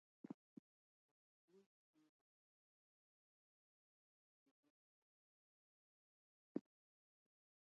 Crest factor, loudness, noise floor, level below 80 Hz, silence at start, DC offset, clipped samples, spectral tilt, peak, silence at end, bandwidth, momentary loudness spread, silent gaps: 34 dB; -56 LUFS; under -90 dBFS; under -90 dBFS; 0.3 s; under 0.1%; under 0.1%; -8 dB/octave; -32 dBFS; 1.05 s; 3.3 kHz; 15 LU; 0.34-1.48 s, 1.66-1.94 s, 2.09-4.63 s, 4.70-6.55 s